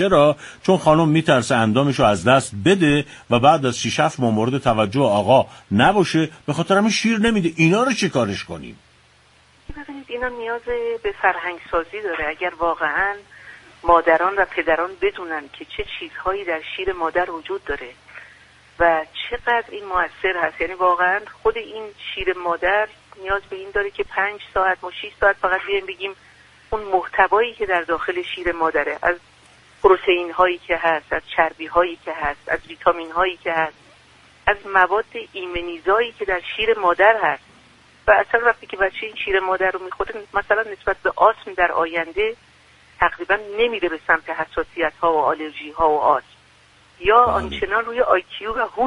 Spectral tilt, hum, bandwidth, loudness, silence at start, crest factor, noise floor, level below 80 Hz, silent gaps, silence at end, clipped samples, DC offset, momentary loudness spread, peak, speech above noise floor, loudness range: -5 dB/octave; none; 11 kHz; -20 LUFS; 0 s; 20 dB; -54 dBFS; -46 dBFS; none; 0 s; under 0.1%; under 0.1%; 12 LU; -2 dBFS; 34 dB; 6 LU